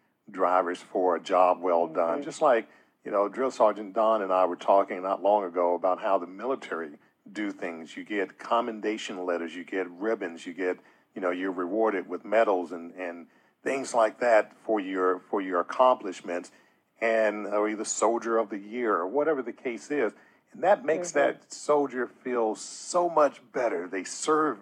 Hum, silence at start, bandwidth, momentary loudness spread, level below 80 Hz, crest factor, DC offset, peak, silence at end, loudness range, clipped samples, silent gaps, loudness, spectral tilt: none; 0.3 s; 11 kHz; 12 LU; under -90 dBFS; 20 dB; under 0.1%; -8 dBFS; 0 s; 6 LU; under 0.1%; none; -27 LUFS; -3.5 dB/octave